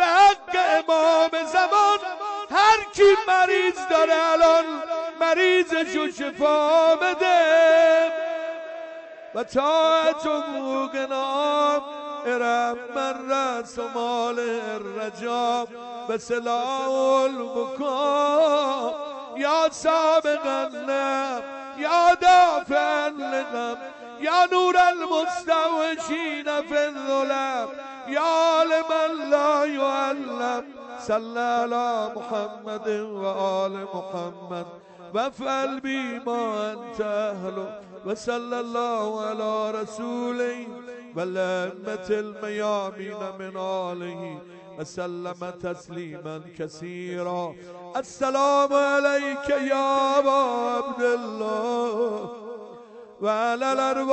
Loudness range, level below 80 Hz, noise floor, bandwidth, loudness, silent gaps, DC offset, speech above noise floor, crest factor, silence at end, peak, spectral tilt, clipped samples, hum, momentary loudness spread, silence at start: 10 LU; -64 dBFS; -44 dBFS; 8.6 kHz; -23 LUFS; none; under 0.1%; 21 dB; 16 dB; 0 s; -8 dBFS; -3.5 dB/octave; under 0.1%; none; 16 LU; 0 s